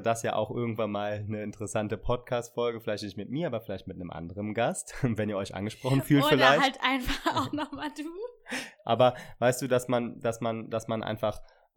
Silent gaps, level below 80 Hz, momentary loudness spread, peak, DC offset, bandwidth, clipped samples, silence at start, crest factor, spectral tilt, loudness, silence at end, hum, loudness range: none; -50 dBFS; 13 LU; -6 dBFS; under 0.1%; 19 kHz; under 0.1%; 0 s; 24 dB; -5 dB/octave; -29 LUFS; 0.3 s; none; 7 LU